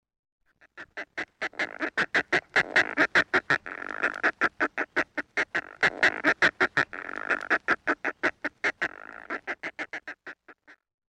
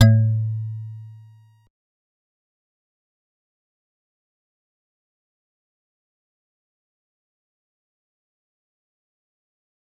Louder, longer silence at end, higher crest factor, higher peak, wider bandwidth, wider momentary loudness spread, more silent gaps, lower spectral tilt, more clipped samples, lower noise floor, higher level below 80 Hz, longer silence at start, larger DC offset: second, -27 LUFS vs -22 LUFS; second, 0.35 s vs 8.85 s; second, 20 dB vs 26 dB; second, -10 dBFS vs -2 dBFS; first, 10.5 kHz vs 7.8 kHz; second, 14 LU vs 23 LU; neither; second, -3 dB/octave vs -7 dB/octave; neither; first, -55 dBFS vs -50 dBFS; second, -66 dBFS vs -58 dBFS; first, 0.75 s vs 0 s; neither